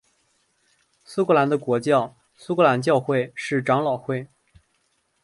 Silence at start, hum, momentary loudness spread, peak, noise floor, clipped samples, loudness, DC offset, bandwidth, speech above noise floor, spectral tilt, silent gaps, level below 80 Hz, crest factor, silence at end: 1.1 s; none; 11 LU; -4 dBFS; -69 dBFS; under 0.1%; -22 LUFS; under 0.1%; 11.5 kHz; 48 dB; -6.5 dB/octave; none; -66 dBFS; 20 dB; 1 s